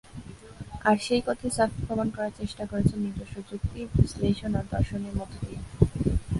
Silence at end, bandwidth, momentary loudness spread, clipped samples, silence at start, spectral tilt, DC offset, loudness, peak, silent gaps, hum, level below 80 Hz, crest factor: 0 s; 11.5 kHz; 13 LU; under 0.1%; 0.05 s; -6.5 dB/octave; under 0.1%; -28 LUFS; -4 dBFS; none; none; -38 dBFS; 24 dB